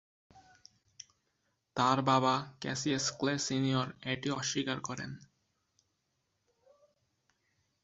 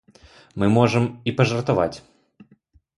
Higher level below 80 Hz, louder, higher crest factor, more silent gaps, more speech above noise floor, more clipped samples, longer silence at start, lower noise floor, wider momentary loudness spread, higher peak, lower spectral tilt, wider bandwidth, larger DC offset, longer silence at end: second, -72 dBFS vs -52 dBFS; second, -32 LUFS vs -21 LUFS; about the same, 22 dB vs 22 dB; neither; first, 48 dB vs 38 dB; neither; second, 0.35 s vs 0.55 s; first, -81 dBFS vs -58 dBFS; first, 22 LU vs 12 LU; second, -14 dBFS vs -2 dBFS; second, -4 dB/octave vs -7 dB/octave; second, 7.6 kHz vs 11.5 kHz; neither; first, 2.65 s vs 1 s